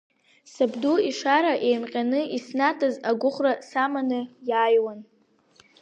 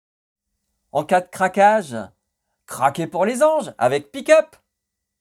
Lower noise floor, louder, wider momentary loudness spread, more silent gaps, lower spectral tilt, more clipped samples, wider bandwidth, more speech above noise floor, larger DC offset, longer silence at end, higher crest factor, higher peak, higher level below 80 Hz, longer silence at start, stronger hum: second, -59 dBFS vs -80 dBFS; second, -24 LUFS vs -19 LUFS; second, 7 LU vs 16 LU; neither; about the same, -4 dB/octave vs -4.5 dB/octave; neither; second, 8.8 kHz vs 14.5 kHz; second, 36 dB vs 61 dB; neither; about the same, 0.8 s vs 0.75 s; about the same, 18 dB vs 20 dB; second, -8 dBFS vs 0 dBFS; second, -82 dBFS vs -68 dBFS; second, 0.55 s vs 0.95 s; neither